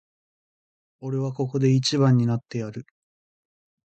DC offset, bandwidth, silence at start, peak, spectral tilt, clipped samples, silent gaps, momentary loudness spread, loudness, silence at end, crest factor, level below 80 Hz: under 0.1%; 8.8 kHz; 1 s; -8 dBFS; -6.5 dB/octave; under 0.1%; none; 16 LU; -23 LUFS; 1.15 s; 16 dB; -62 dBFS